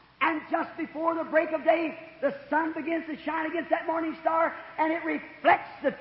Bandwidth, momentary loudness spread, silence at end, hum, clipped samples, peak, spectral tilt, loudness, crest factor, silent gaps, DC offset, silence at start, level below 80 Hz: 5.8 kHz; 7 LU; 0 s; none; under 0.1%; -10 dBFS; -8.5 dB/octave; -28 LUFS; 18 dB; none; under 0.1%; 0.2 s; -68 dBFS